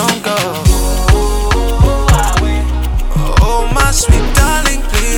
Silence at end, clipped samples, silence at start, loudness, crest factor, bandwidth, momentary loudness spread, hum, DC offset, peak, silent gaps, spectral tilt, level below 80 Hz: 0 s; under 0.1%; 0 s; -13 LUFS; 10 dB; 18 kHz; 5 LU; none; under 0.1%; 0 dBFS; none; -4 dB/octave; -12 dBFS